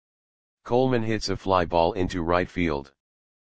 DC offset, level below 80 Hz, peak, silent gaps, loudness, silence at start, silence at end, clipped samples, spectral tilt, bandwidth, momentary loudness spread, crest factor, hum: 1%; -46 dBFS; -6 dBFS; none; -25 LUFS; 0.55 s; 0.55 s; under 0.1%; -6 dB/octave; 9.4 kHz; 5 LU; 20 dB; none